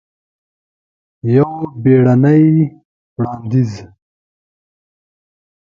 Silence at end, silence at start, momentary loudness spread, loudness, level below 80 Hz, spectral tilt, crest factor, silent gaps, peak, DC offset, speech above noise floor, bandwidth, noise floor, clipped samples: 1.8 s; 1.25 s; 14 LU; -13 LUFS; -54 dBFS; -10.5 dB/octave; 16 dB; 2.85-3.16 s; 0 dBFS; under 0.1%; over 78 dB; 7.2 kHz; under -90 dBFS; under 0.1%